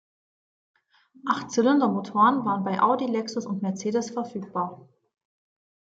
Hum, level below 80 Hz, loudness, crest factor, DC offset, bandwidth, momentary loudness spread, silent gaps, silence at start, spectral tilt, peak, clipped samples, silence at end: none; -76 dBFS; -25 LUFS; 18 dB; under 0.1%; 8 kHz; 11 LU; none; 1.25 s; -5.5 dB/octave; -8 dBFS; under 0.1%; 1.1 s